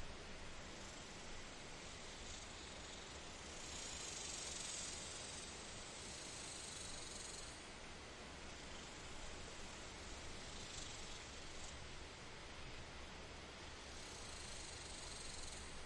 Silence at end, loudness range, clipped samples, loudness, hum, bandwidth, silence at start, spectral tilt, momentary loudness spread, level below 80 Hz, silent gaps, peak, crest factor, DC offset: 0 s; 5 LU; under 0.1%; -51 LUFS; none; 11.5 kHz; 0 s; -2 dB/octave; 7 LU; -60 dBFS; none; -36 dBFS; 16 dB; under 0.1%